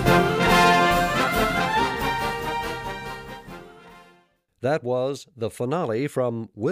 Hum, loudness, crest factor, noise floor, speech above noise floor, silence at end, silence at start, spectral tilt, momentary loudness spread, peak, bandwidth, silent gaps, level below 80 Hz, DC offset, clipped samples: none; -22 LUFS; 20 dB; -61 dBFS; 36 dB; 0 s; 0 s; -5 dB/octave; 17 LU; -4 dBFS; 15.5 kHz; none; -42 dBFS; under 0.1%; under 0.1%